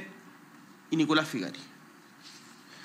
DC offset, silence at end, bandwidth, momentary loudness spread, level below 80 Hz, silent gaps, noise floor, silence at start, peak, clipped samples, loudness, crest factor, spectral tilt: under 0.1%; 0 s; 15.5 kHz; 27 LU; under -90 dBFS; none; -54 dBFS; 0 s; -10 dBFS; under 0.1%; -29 LUFS; 24 dB; -4.5 dB/octave